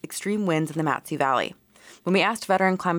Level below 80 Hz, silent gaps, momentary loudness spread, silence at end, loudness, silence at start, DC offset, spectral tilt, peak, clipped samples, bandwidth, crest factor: -70 dBFS; none; 6 LU; 0 s; -24 LUFS; 0.05 s; under 0.1%; -5 dB/octave; -10 dBFS; under 0.1%; 19 kHz; 16 dB